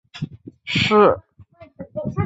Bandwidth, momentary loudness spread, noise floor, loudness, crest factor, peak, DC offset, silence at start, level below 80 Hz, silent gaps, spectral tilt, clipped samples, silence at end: 8 kHz; 21 LU; -47 dBFS; -18 LUFS; 20 dB; -2 dBFS; under 0.1%; 0.15 s; -46 dBFS; none; -6 dB/octave; under 0.1%; 0 s